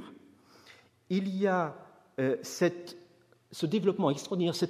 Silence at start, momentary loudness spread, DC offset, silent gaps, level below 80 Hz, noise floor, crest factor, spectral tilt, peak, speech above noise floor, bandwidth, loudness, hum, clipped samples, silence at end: 0 s; 19 LU; under 0.1%; none; -80 dBFS; -62 dBFS; 20 dB; -6 dB/octave; -14 dBFS; 32 dB; 15 kHz; -31 LUFS; none; under 0.1%; 0 s